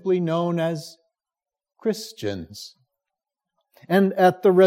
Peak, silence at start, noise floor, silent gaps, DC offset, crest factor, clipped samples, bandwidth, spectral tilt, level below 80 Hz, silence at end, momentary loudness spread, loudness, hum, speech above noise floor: -6 dBFS; 0.05 s; under -90 dBFS; none; under 0.1%; 18 dB; under 0.1%; 16 kHz; -6.5 dB/octave; -70 dBFS; 0 s; 21 LU; -22 LUFS; none; over 69 dB